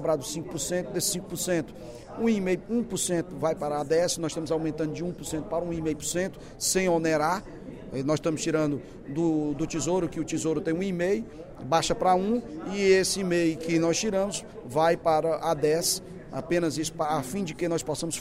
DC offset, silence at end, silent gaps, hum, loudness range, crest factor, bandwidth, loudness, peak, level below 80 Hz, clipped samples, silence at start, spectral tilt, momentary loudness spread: under 0.1%; 0 s; none; none; 3 LU; 18 dB; 16 kHz; -27 LUFS; -10 dBFS; -52 dBFS; under 0.1%; 0 s; -4.5 dB/octave; 9 LU